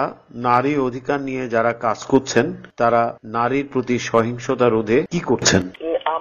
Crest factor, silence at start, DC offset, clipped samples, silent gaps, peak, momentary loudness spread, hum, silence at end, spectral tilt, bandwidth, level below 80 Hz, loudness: 18 dB; 0 s; under 0.1%; under 0.1%; none; -2 dBFS; 6 LU; none; 0 s; -4.5 dB/octave; 10 kHz; -50 dBFS; -20 LUFS